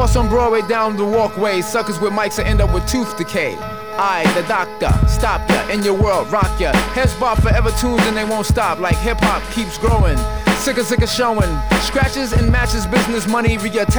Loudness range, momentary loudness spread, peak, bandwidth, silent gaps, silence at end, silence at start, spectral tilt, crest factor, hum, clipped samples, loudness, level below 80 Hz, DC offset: 2 LU; 4 LU; -2 dBFS; over 20 kHz; none; 0 s; 0 s; -5 dB/octave; 14 dB; none; under 0.1%; -17 LUFS; -22 dBFS; 1%